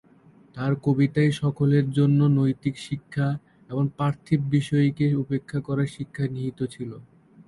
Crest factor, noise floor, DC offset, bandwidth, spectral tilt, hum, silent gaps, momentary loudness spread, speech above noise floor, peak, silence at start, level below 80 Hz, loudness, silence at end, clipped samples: 16 dB; -54 dBFS; under 0.1%; 11.5 kHz; -8 dB/octave; none; none; 11 LU; 31 dB; -8 dBFS; 0.55 s; -58 dBFS; -24 LUFS; 0.45 s; under 0.1%